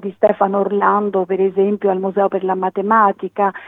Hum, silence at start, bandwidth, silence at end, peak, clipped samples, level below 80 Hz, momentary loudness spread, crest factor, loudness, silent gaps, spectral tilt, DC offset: none; 0 s; 3.8 kHz; 0 s; 0 dBFS; under 0.1%; -74 dBFS; 5 LU; 16 dB; -17 LUFS; none; -9.5 dB/octave; under 0.1%